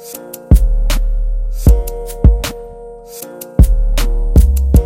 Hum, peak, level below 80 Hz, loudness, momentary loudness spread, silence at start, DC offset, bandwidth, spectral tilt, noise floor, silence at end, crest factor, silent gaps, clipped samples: none; 0 dBFS; -12 dBFS; -15 LUFS; 18 LU; 0 s; under 0.1%; 16.5 kHz; -6.5 dB/octave; -32 dBFS; 0 s; 12 dB; none; 1%